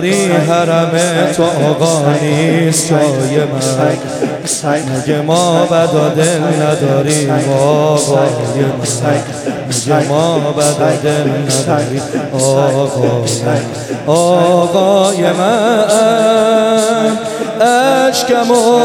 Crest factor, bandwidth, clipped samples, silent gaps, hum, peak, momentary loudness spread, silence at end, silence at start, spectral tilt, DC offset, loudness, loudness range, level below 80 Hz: 12 dB; 17 kHz; under 0.1%; none; none; 0 dBFS; 6 LU; 0 s; 0 s; -5 dB/octave; under 0.1%; -12 LUFS; 3 LU; -54 dBFS